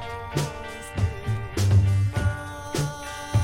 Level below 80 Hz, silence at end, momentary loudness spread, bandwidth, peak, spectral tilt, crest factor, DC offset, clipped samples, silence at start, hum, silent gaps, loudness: -38 dBFS; 0 s; 13 LU; 15.5 kHz; -8 dBFS; -6 dB/octave; 16 dB; under 0.1%; under 0.1%; 0 s; none; none; -26 LUFS